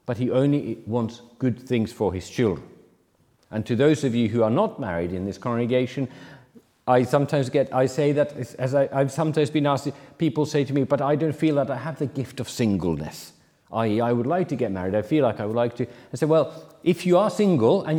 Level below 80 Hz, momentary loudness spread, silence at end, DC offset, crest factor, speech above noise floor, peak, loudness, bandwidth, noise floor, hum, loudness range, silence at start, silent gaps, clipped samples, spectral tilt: -60 dBFS; 10 LU; 0 s; under 0.1%; 18 dB; 40 dB; -6 dBFS; -24 LUFS; 17 kHz; -63 dBFS; none; 3 LU; 0.1 s; none; under 0.1%; -7 dB/octave